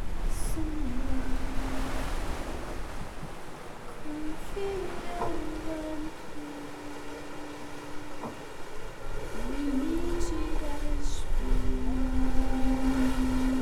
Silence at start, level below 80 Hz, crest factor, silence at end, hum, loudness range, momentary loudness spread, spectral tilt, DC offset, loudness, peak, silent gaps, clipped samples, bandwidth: 0 s; -32 dBFS; 16 dB; 0 s; none; 8 LU; 13 LU; -5.5 dB/octave; under 0.1%; -35 LUFS; -10 dBFS; none; under 0.1%; 13.5 kHz